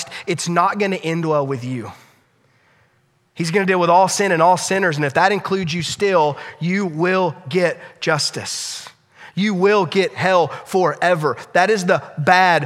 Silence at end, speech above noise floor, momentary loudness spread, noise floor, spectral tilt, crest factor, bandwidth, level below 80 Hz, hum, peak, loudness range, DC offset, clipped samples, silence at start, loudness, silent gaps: 0 s; 43 dB; 10 LU; -61 dBFS; -4.5 dB/octave; 18 dB; 15 kHz; -64 dBFS; none; 0 dBFS; 5 LU; under 0.1%; under 0.1%; 0 s; -18 LUFS; none